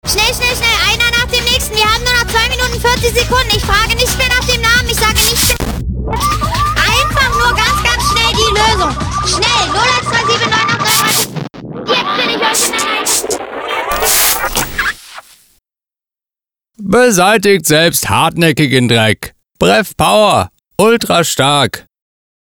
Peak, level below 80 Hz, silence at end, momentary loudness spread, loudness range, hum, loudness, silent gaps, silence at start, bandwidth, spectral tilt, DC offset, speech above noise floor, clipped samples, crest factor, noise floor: 0 dBFS; -26 dBFS; 0.6 s; 7 LU; 3 LU; none; -11 LUFS; none; 0.05 s; over 20 kHz; -3 dB/octave; under 0.1%; over 80 dB; under 0.1%; 12 dB; under -90 dBFS